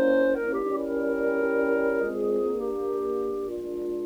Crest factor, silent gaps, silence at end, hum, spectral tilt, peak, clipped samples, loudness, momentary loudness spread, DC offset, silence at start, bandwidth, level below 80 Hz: 14 dB; none; 0 s; none; -6.5 dB/octave; -12 dBFS; under 0.1%; -27 LUFS; 7 LU; under 0.1%; 0 s; over 20 kHz; -56 dBFS